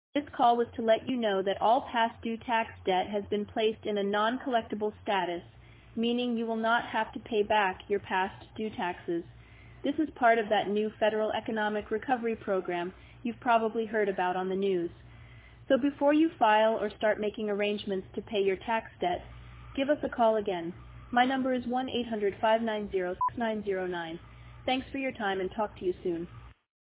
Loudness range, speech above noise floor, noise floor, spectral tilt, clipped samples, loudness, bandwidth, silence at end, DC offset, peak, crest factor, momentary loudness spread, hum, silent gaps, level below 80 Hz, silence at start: 3 LU; 22 dB; -51 dBFS; -3 dB/octave; under 0.1%; -30 LUFS; 4 kHz; 0.3 s; under 0.1%; -10 dBFS; 18 dB; 10 LU; none; none; -58 dBFS; 0.15 s